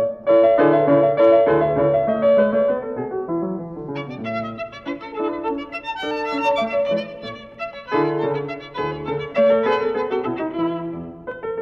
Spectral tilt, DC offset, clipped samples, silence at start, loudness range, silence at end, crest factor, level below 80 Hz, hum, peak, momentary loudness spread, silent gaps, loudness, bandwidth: -7.5 dB/octave; under 0.1%; under 0.1%; 0 s; 9 LU; 0 s; 16 dB; -54 dBFS; none; -4 dBFS; 16 LU; none; -20 LUFS; 6.8 kHz